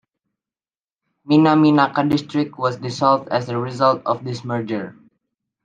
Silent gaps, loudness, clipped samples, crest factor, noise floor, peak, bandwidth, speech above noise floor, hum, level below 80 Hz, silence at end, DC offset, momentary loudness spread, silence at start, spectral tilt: none; -19 LUFS; under 0.1%; 18 dB; under -90 dBFS; -2 dBFS; 7.6 kHz; over 72 dB; none; -60 dBFS; 0.7 s; under 0.1%; 11 LU; 1.25 s; -7 dB/octave